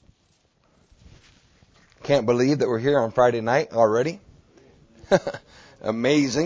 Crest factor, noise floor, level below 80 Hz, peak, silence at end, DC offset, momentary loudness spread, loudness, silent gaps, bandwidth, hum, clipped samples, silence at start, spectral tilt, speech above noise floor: 20 dB; -64 dBFS; -56 dBFS; -4 dBFS; 0 s; under 0.1%; 14 LU; -22 LUFS; none; 8 kHz; none; under 0.1%; 2.05 s; -5.5 dB/octave; 44 dB